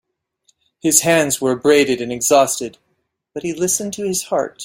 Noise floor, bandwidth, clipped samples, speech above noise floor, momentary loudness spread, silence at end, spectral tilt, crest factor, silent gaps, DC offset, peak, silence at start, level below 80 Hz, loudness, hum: -70 dBFS; 16.5 kHz; under 0.1%; 53 dB; 12 LU; 0 s; -3 dB/octave; 18 dB; none; under 0.1%; 0 dBFS; 0.85 s; -58 dBFS; -16 LUFS; none